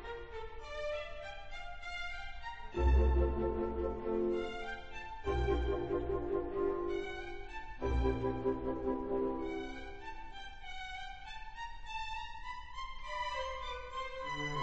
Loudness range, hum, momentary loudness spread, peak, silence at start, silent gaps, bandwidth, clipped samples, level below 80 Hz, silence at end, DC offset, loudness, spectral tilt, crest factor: 8 LU; none; 13 LU; -18 dBFS; 0 s; none; 7.8 kHz; under 0.1%; -42 dBFS; 0 s; 0.2%; -39 LUFS; -7 dB/octave; 18 dB